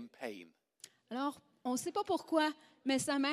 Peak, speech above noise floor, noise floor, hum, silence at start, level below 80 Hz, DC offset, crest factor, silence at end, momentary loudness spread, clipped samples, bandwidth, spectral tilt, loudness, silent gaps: -18 dBFS; 25 dB; -61 dBFS; none; 0 s; -80 dBFS; under 0.1%; 20 dB; 0 s; 20 LU; under 0.1%; 15 kHz; -3 dB/octave; -37 LUFS; none